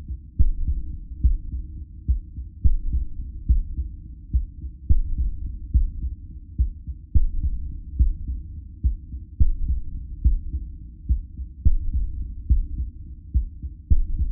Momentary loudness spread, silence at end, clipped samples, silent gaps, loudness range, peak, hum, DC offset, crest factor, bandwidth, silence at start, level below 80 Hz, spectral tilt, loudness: 12 LU; 0 s; under 0.1%; none; 1 LU; -6 dBFS; none; under 0.1%; 16 dB; 0.6 kHz; 0 s; -24 dBFS; -16.5 dB/octave; -28 LUFS